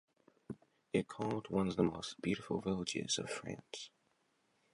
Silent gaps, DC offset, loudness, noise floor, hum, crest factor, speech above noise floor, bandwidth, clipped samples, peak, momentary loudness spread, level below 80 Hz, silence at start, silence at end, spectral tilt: none; under 0.1%; -39 LUFS; -78 dBFS; none; 22 dB; 39 dB; 11.5 kHz; under 0.1%; -18 dBFS; 17 LU; -66 dBFS; 0.5 s; 0.85 s; -4.5 dB/octave